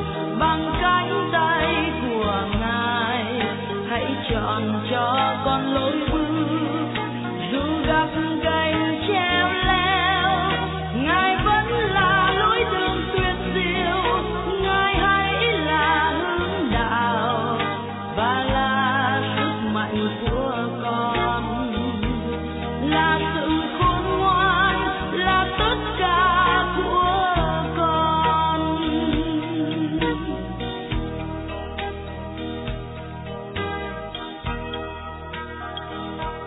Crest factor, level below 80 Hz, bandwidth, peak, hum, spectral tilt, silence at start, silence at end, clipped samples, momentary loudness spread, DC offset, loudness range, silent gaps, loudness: 14 dB; -36 dBFS; 4.1 kHz; -8 dBFS; none; -9 dB/octave; 0 s; 0 s; under 0.1%; 11 LU; under 0.1%; 9 LU; none; -22 LUFS